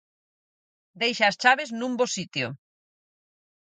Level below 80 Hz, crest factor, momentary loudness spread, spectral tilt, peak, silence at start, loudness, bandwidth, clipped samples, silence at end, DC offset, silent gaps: -76 dBFS; 24 dB; 10 LU; -3 dB/octave; -4 dBFS; 0.95 s; -24 LUFS; 9.6 kHz; under 0.1%; 1.05 s; under 0.1%; none